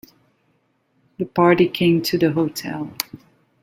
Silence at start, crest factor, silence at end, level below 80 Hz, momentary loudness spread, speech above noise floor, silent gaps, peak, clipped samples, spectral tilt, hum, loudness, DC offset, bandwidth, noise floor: 1.2 s; 22 dB; 0.45 s; -58 dBFS; 13 LU; 46 dB; none; 0 dBFS; under 0.1%; -5.5 dB/octave; none; -20 LUFS; under 0.1%; 17 kHz; -65 dBFS